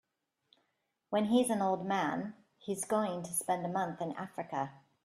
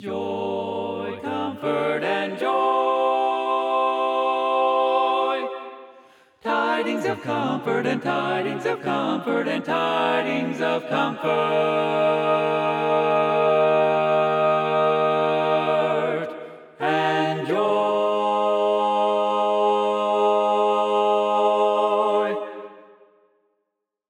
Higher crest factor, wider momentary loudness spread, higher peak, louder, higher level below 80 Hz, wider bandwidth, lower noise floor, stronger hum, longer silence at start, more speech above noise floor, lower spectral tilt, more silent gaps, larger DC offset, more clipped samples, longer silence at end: first, 20 dB vs 14 dB; first, 12 LU vs 7 LU; second, -16 dBFS vs -8 dBFS; second, -34 LUFS vs -22 LUFS; about the same, -76 dBFS vs -80 dBFS; first, 15 kHz vs 11.5 kHz; about the same, -82 dBFS vs -79 dBFS; neither; first, 1.1 s vs 0 s; second, 48 dB vs 57 dB; second, -4.5 dB/octave vs -6 dB/octave; neither; neither; neither; second, 0.3 s vs 1.3 s